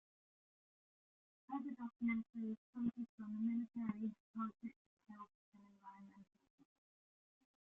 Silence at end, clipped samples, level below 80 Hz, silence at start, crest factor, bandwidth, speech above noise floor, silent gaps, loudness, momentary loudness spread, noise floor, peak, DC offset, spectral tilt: 1.5 s; under 0.1%; -84 dBFS; 1.5 s; 18 dB; 3.7 kHz; over 45 dB; 2.58-2.73 s, 3.09-3.18 s, 4.20-4.34 s, 4.76-4.97 s, 5.35-5.52 s; -46 LUFS; 19 LU; under -90 dBFS; -30 dBFS; under 0.1%; -7.5 dB/octave